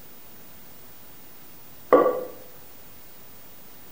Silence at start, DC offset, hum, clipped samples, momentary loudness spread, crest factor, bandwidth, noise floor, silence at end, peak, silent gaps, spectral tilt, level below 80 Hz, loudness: 1.9 s; 0.7%; none; under 0.1%; 25 LU; 28 dB; 16.5 kHz; -48 dBFS; 1.6 s; 0 dBFS; none; -5.5 dB/octave; -64 dBFS; -22 LUFS